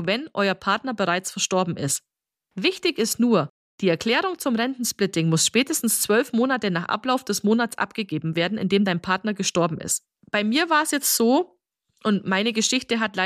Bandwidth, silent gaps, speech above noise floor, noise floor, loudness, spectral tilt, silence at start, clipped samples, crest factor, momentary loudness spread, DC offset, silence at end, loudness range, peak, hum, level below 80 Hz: 15.5 kHz; 3.50-3.78 s; 45 dB; -68 dBFS; -22 LUFS; -3.5 dB/octave; 0 s; under 0.1%; 16 dB; 7 LU; under 0.1%; 0 s; 2 LU; -8 dBFS; none; -66 dBFS